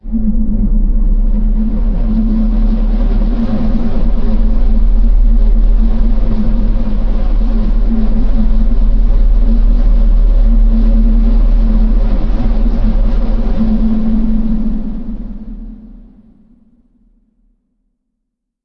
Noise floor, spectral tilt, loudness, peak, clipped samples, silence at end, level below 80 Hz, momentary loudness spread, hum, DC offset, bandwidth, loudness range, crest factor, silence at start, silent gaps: -72 dBFS; -10.5 dB/octave; -16 LUFS; 0 dBFS; under 0.1%; 2.7 s; -10 dBFS; 5 LU; none; under 0.1%; 2.6 kHz; 5 LU; 10 dB; 0.05 s; none